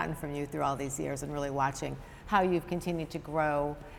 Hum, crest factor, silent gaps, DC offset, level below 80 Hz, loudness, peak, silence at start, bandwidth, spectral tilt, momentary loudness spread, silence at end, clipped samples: none; 20 dB; none; under 0.1%; -50 dBFS; -32 LUFS; -12 dBFS; 0 s; 17.5 kHz; -5.5 dB/octave; 8 LU; 0 s; under 0.1%